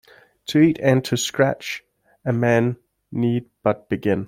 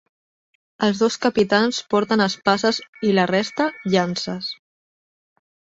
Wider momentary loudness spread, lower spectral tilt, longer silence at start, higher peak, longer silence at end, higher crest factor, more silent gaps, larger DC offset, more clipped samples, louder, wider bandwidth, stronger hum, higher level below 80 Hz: first, 14 LU vs 8 LU; first, -6 dB/octave vs -4.5 dB/octave; second, 0.5 s vs 0.8 s; about the same, -2 dBFS vs -2 dBFS; second, 0 s vs 1.2 s; about the same, 18 dB vs 20 dB; second, none vs 2.88-2.93 s; neither; neither; about the same, -21 LUFS vs -20 LUFS; first, 16.5 kHz vs 8 kHz; neither; about the same, -58 dBFS vs -62 dBFS